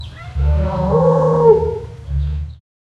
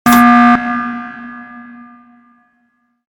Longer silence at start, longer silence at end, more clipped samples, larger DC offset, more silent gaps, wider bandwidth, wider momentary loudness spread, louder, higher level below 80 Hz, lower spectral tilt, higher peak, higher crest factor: about the same, 0 s vs 0.05 s; second, 0.45 s vs 1.45 s; second, under 0.1% vs 0.4%; neither; neither; second, 7 kHz vs 18.5 kHz; second, 16 LU vs 26 LU; second, -16 LUFS vs -10 LUFS; first, -24 dBFS vs -46 dBFS; first, -9.5 dB/octave vs -4.5 dB/octave; about the same, 0 dBFS vs 0 dBFS; about the same, 16 dB vs 14 dB